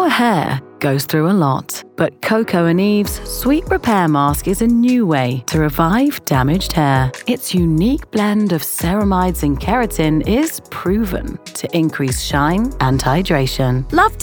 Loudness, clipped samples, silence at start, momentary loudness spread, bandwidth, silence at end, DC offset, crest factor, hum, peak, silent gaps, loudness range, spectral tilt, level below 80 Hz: -16 LUFS; under 0.1%; 0 s; 6 LU; over 20 kHz; 0 s; under 0.1%; 14 dB; none; -2 dBFS; none; 2 LU; -5.5 dB/octave; -30 dBFS